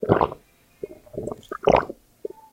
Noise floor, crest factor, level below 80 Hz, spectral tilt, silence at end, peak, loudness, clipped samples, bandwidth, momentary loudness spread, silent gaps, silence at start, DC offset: -52 dBFS; 26 dB; -46 dBFS; -7 dB/octave; 0.25 s; 0 dBFS; -23 LUFS; under 0.1%; 16.5 kHz; 20 LU; none; 0 s; under 0.1%